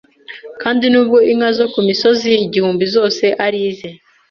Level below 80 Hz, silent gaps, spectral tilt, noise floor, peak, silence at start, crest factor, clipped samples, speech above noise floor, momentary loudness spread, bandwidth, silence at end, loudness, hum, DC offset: -58 dBFS; none; -5 dB/octave; -34 dBFS; -2 dBFS; 0.3 s; 12 dB; under 0.1%; 21 dB; 19 LU; 7 kHz; 0.35 s; -14 LUFS; none; under 0.1%